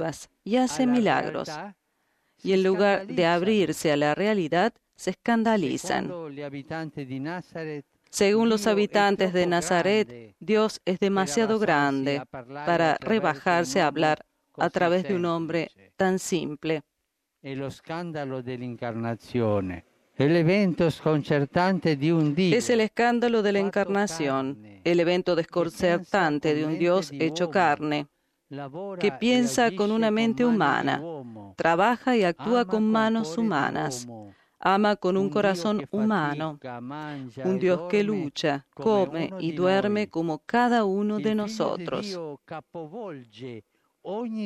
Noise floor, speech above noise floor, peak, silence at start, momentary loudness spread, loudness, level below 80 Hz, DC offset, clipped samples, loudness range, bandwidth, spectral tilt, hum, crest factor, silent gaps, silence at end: -79 dBFS; 55 dB; -8 dBFS; 0 s; 14 LU; -25 LUFS; -64 dBFS; under 0.1%; under 0.1%; 5 LU; 14 kHz; -5.5 dB/octave; none; 18 dB; none; 0 s